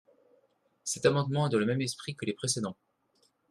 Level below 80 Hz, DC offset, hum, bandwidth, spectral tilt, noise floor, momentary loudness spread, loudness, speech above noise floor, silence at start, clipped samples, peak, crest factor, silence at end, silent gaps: -70 dBFS; under 0.1%; none; 13 kHz; -4.5 dB/octave; -72 dBFS; 9 LU; -31 LUFS; 42 dB; 0.85 s; under 0.1%; -10 dBFS; 22 dB; 0.75 s; none